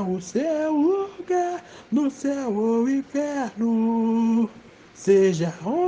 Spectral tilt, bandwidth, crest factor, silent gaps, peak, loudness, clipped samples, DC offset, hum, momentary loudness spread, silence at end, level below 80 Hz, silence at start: -6.5 dB/octave; 9.2 kHz; 16 dB; none; -8 dBFS; -23 LUFS; under 0.1%; under 0.1%; none; 7 LU; 0 s; -64 dBFS; 0 s